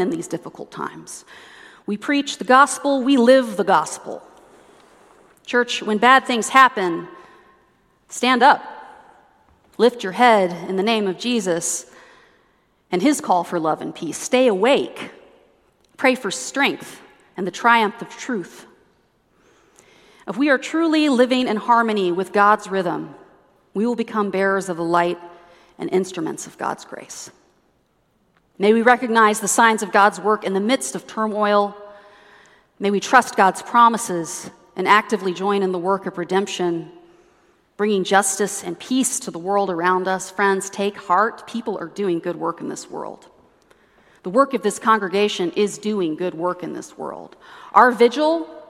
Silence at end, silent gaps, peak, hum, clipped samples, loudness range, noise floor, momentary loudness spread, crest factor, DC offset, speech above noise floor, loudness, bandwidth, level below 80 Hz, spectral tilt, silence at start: 0.05 s; none; 0 dBFS; none; under 0.1%; 5 LU; -63 dBFS; 17 LU; 20 dB; under 0.1%; 44 dB; -19 LUFS; 16 kHz; -68 dBFS; -3.5 dB/octave; 0 s